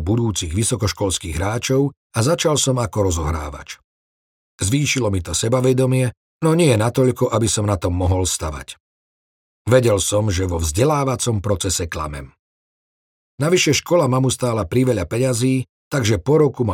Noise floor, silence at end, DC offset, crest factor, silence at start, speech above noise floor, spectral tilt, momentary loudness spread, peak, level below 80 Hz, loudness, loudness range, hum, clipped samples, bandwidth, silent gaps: under -90 dBFS; 0 s; under 0.1%; 18 dB; 0 s; over 72 dB; -5 dB/octave; 9 LU; -2 dBFS; -40 dBFS; -19 LUFS; 3 LU; none; under 0.1%; 16.5 kHz; 1.97-2.10 s, 3.84-4.58 s, 6.17-6.40 s, 8.80-9.65 s, 12.39-13.38 s, 15.69-15.91 s